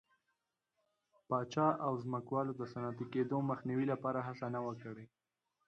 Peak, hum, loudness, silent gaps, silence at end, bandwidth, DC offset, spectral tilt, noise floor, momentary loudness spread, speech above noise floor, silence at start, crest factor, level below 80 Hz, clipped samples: -20 dBFS; none; -38 LUFS; none; 0.6 s; 7.8 kHz; under 0.1%; -8 dB/octave; -86 dBFS; 9 LU; 48 dB; 1.3 s; 18 dB; -78 dBFS; under 0.1%